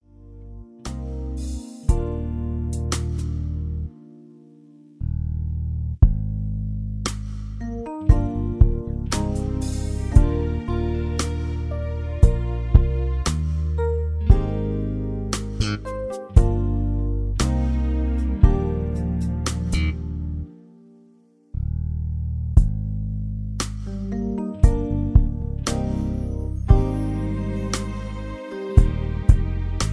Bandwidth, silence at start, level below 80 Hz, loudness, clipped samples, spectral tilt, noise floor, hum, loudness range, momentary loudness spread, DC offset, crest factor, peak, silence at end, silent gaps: 11 kHz; 0.2 s; -24 dBFS; -24 LUFS; under 0.1%; -6.5 dB/octave; -55 dBFS; none; 5 LU; 11 LU; under 0.1%; 20 dB; 0 dBFS; 0 s; none